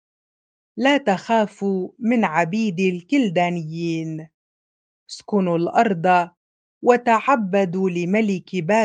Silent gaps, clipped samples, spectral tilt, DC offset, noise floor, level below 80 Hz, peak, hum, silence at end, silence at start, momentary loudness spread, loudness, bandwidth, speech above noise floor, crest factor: 4.34-5.06 s, 6.37-6.81 s; under 0.1%; -6.5 dB/octave; under 0.1%; under -90 dBFS; -70 dBFS; -2 dBFS; none; 0 s; 0.75 s; 8 LU; -20 LUFS; 9.2 kHz; over 70 dB; 20 dB